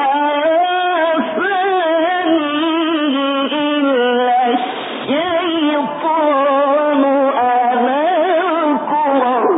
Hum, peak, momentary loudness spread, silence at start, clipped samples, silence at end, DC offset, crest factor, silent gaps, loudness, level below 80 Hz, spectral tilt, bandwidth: none; -4 dBFS; 3 LU; 0 s; under 0.1%; 0 s; under 0.1%; 12 dB; none; -15 LUFS; -68 dBFS; -9 dB/octave; 4 kHz